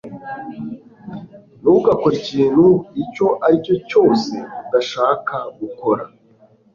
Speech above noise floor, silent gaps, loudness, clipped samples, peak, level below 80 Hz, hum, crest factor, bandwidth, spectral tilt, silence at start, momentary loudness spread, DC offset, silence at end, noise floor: 35 dB; none; -17 LUFS; under 0.1%; -2 dBFS; -54 dBFS; none; 16 dB; 7.4 kHz; -7 dB/octave; 0.05 s; 18 LU; under 0.1%; 0.7 s; -52 dBFS